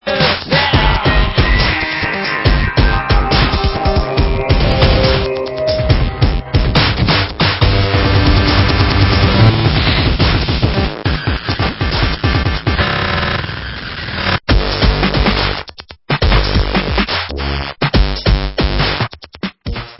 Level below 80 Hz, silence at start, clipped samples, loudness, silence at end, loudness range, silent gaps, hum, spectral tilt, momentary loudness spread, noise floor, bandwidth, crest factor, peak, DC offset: -18 dBFS; 0.05 s; under 0.1%; -14 LUFS; 0.05 s; 4 LU; none; none; -8.5 dB/octave; 7 LU; -33 dBFS; 5.8 kHz; 14 dB; 0 dBFS; under 0.1%